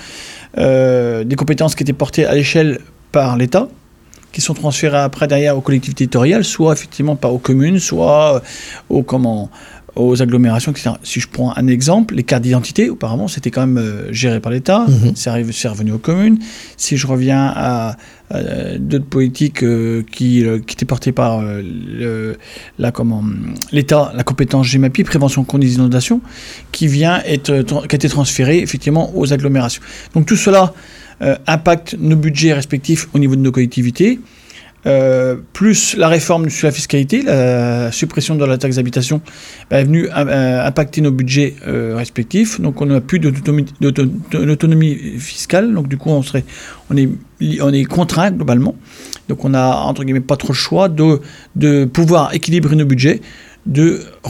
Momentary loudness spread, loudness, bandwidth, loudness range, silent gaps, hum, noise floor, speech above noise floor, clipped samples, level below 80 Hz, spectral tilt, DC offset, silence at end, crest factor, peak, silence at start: 9 LU; -14 LUFS; 15.5 kHz; 3 LU; none; none; -44 dBFS; 30 dB; under 0.1%; -42 dBFS; -6 dB/octave; under 0.1%; 0 s; 14 dB; 0 dBFS; 0 s